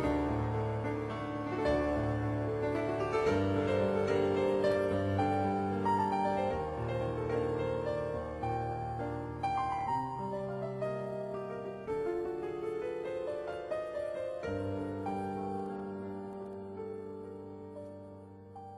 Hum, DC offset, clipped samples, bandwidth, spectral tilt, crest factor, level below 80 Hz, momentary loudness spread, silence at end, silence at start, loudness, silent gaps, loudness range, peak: none; under 0.1%; under 0.1%; 12 kHz; -7.5 dB/octave; 16 dB; -52 dBFS; 12 LU; 0 s; 0 s; -35 LUFS; none; 8 LU; -18 dBFS